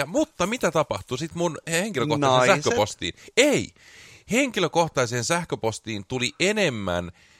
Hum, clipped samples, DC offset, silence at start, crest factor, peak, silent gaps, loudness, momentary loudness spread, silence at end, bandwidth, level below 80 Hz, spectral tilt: none; under 0.1%; under 0.1%; 0 s; 22 dB; -4 dBFS; none; -24 LUFS; 9 LU; 0.3 s; 16 kHz; -56 dBFS; -4 dB/octave